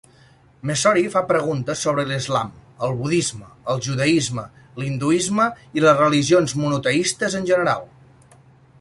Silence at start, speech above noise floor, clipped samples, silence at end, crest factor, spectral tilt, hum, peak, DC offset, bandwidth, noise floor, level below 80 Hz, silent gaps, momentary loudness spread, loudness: 0.65 s; 32 dB; under 0.1%; 0.95 s; 18 dB; -4.5 dB/octave; none; -2 dBFS; under 0.1%; 11.5 kHz; -52 dBFS; -54 dBFS; none; 11 LU; -20 LUFS